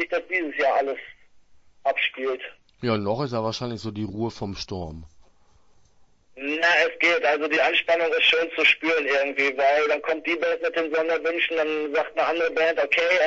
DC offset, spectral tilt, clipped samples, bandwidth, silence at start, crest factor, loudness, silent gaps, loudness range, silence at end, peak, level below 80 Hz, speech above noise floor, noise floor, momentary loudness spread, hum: under 0.1%; -4.5 dB/octave; under 0.1%; 7.8 kHz; 0 s; 18 dB; -23 LUFS; none; 10 LU; 0 s; -6 dBFS; -58 dBFS; 34 dB; -57 dBFS; 13 LU; none